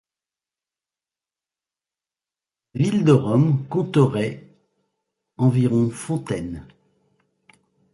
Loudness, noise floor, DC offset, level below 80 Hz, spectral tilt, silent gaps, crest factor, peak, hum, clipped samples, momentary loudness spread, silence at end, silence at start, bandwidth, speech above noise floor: -21 LUFS; under -90 dBFS; under 0.1%; -56 dBFS; -8 dB/octave; none; 20 dB; -4 dBFS; none; under 0.1%; 15 LU; 1.3 s; 2.75 s; 11.5 kHz; over 71 dB